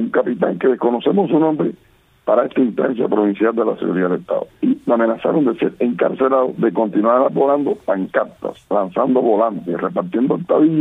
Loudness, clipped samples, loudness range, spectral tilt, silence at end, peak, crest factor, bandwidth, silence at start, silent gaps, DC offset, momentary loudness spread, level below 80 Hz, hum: -17 LUFS; under 0.1%; 2 LU; -9.5 dB/octave; 0 s; -2 dBFS; 16 dB; 3.9 kHz; 0 s; none; under 0.1%; 6 LU; -62 dBFS; none